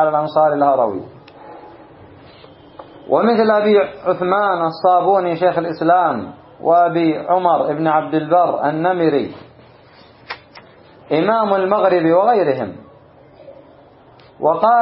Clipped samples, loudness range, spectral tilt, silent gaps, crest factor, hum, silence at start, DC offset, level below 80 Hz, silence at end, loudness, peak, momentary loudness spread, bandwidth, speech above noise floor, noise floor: under 0.1%; 4 LU; -11.5 dB/octave; none; 16 dB; none; 0 s; under 0.1%; -62 dBFS; 0 s; -16 LUFS; -2 dBFS; 10 LU; 5.8 kHz; 31 dB; -45 dBFS